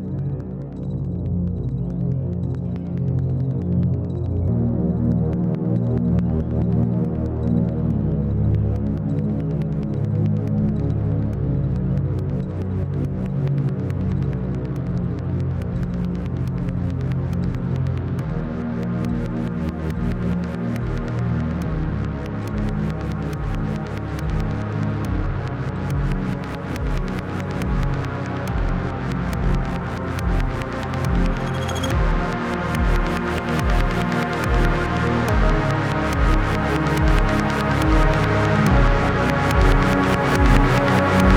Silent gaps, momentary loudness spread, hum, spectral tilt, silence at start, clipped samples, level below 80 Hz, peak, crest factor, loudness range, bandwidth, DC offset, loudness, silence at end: none; 8 LU; none; -7.5 dB/octave; 0 s; under 0.1%; -26 dBFS; -2 dBFS; 18 dB; 6 LU; 16 kHz; under 0.1%; -22 LUFS; 0 s